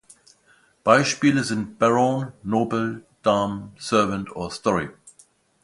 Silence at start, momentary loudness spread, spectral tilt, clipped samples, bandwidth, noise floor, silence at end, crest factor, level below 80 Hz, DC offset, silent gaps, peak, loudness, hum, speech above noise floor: 0.85 s; 11 LU; -5 dB/octave; under 0.1%; 11.5 kHz; -59 dBFS; 0.55 s; 22 dB; -56 dBFS; under 0.1%; none; -2 dBFS; -22 LUFS; none; 38 dB